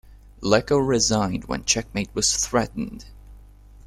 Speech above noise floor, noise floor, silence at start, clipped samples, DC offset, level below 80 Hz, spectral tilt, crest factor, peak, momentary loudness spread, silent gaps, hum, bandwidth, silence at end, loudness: 24 dB; -46 dBFS; 0.1 s; under 0.1%; under 0.1%; -42 dBFS; -3.5 dB/octave; 20 dB; -4 dBFS; 12 LU; none; 50 Hz at -40 dBFS; 15 kHz; 0 s; -22 LUFS